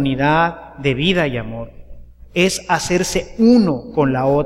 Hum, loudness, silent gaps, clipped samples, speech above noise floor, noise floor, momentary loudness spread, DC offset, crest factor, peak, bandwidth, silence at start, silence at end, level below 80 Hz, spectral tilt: none; -17 LUFS; none; under 0.1%; 20 dB; -37 dBFS; 12 LU; under 0.1%; 16 dB; -2 dBFS; 15 kHz; 0 s; 0 s; -38 dBFS; -5 dB/octave